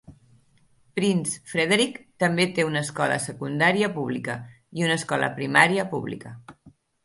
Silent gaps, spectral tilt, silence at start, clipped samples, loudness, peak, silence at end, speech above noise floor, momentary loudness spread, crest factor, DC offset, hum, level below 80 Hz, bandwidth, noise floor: none; -4.5 dB/octave; 0.1 s; under 0.1%; -24 LUFS; -2 dBFS; 0.35 s; 37 dB; 13 LU; 24 dB; under 0.1%; none; -64 dBFS; 11.5 kHz; -61 dBFS